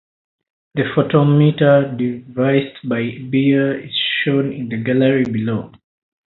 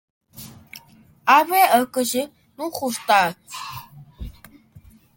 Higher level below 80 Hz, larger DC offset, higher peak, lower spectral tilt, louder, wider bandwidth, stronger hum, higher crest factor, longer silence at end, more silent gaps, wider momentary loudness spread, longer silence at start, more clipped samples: second, -56 dBFS vs -48 dBFS; neither; about the same, 0 dBFS vs -2 dBFS; first, -10 dB/octave vs -3 dB/octave; about the same, -17 LUFS vs -19 LUFS; second, 4.2 kHz vs 17 kHz; neither; about the same, 16 dB vs 20 dB; first, 0.6 s vs 0.35 s; neither; second, 10 LU vs 24 LU; first, 0.75 s vs 0.35 s; neither